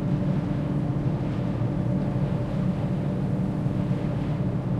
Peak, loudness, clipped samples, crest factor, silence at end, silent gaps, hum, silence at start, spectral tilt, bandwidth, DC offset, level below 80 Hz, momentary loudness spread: -14 dBFS; -27 LUFS; under 0.1%; 12 dB; 0 s; none; none; 0 s; -9.5 dB/octave; 8.2 kHz; under 0.1%; -42 dBFS; 1 LU